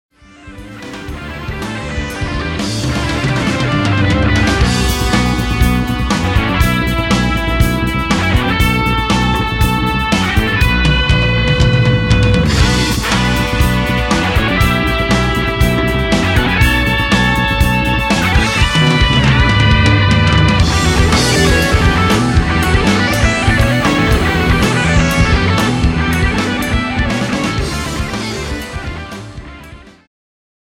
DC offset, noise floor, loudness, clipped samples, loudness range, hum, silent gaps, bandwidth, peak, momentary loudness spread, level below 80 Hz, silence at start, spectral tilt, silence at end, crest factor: under 0.1%; -36 dBFS; -13 LUFS; under 0.1%; 6 LU; none; none; 17.5 kHz; 0 dBFS; 9 LU; -20 dBFS; 0.45 s; -5 dB/octave; 0.9 s; 12 dB